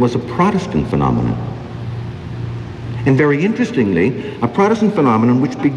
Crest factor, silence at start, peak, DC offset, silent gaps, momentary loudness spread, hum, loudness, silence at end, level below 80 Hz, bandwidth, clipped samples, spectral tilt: 14 dB; 0 s; -2 dBFS; under 0.1%; none; 13 LU; none; -16 LUFS; 0 s; -38 dBFS; 9.8 kHz; under 0.1%; -8 dB/octave